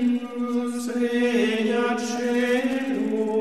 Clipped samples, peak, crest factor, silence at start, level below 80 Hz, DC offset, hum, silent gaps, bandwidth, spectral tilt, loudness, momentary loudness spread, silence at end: under 0.1%; -10 dBFS; 12 dB; 0 s; -68 dBFS; 0.2%; none; none; 13.5 kHz; -4.5 dB/octave; -24 LUFS; 5 LU; 0 s